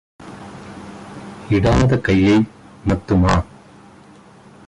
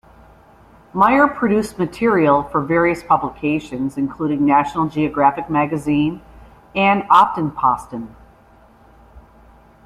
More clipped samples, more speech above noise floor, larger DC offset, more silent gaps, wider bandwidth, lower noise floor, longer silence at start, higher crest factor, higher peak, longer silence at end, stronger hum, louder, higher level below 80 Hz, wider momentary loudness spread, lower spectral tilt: neither; about the same, 30 dB vs 32 dB; neither; neither; second, 11 kHz vs 13 kHz; second, -45 dBFS vs -49 dBFS; second, 0.2 s vs 0.95 s; about the same, 14 dB vs 18 dB; second, -4 dBFS vs 0 dBFS; first, 1.25 s vs 0.65 s; neither; about the same, -17 LUFS vs -17 LUFS; first, -32 dBFS vs -48 dBFS; first, 21 LU vs 11 LU; about the same, -7 dB/octave vs -7 dB/octave